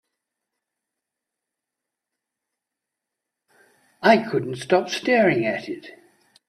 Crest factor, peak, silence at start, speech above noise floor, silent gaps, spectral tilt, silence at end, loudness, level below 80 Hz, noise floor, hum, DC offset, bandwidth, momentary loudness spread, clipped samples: 24 dB; -2 dBFS; 4 s; 65 dB; none; -5.5 dB/octave; 0.6 s; -21 LUFS; -70 dBFS; -85 dBFS; none; under 0.1%; 13.5 kHz; 12 LU; under 0.1%